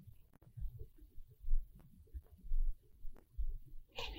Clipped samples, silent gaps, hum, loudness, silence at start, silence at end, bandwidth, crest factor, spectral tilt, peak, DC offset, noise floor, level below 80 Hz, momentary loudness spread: under 0.1%; none; none; -50 LUFS; 0.05 s; 0 s; 6.2 kHz; 18 dB; -5 dB/octave; -22 dBFS; under 0.1%; -60 dBFS; -42 dBFS; 18 LU